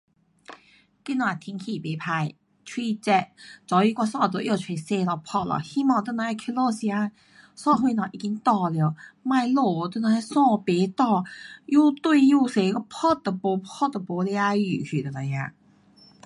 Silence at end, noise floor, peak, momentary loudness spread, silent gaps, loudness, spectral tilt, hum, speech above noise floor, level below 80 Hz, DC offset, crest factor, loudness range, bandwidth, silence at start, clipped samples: 0.75 s; -58 dBFS; -8 dBFS; 11 LU; none; -24 LUFS; -6.5 dB/octave; none; 34 dB; -68 dBFS; under 0.1%; 18 dB; 5 LU; 11.5 kHz; 0.5 s; under 0.1%